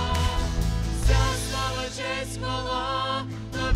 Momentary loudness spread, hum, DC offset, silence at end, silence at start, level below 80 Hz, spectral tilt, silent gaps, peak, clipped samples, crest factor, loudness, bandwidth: 6 LU; none; under 0.1%; 0 s; 0 s; -30 dBFS; -4.5 dB/octave; none; -10 dBFS; under 0.1%; 16 dB; -27 LUFS; 15 kHz